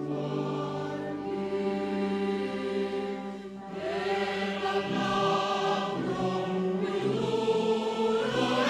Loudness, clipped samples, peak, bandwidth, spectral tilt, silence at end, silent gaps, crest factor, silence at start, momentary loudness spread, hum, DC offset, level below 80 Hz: -30 LUFS; under 0.1%; -16 dBFS; 12 kHz; -6 dB/octave; 0 s; none; 14 dB; 0 s; 7 LU; none; under 0.1%; -64 dBFS